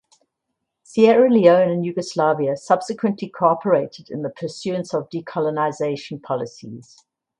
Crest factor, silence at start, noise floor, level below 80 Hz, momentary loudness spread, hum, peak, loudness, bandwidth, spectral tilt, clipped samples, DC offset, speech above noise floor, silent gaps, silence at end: 20 dB; 0.95 s; -78 dBFS; -68 dBFS; 16 LU; none; 0 dBFS; -20 LUFS; 10.5 kHz; -6.5 dB/octave; under 0.1%; under 0.1%; 59 dB; none; 0.6 s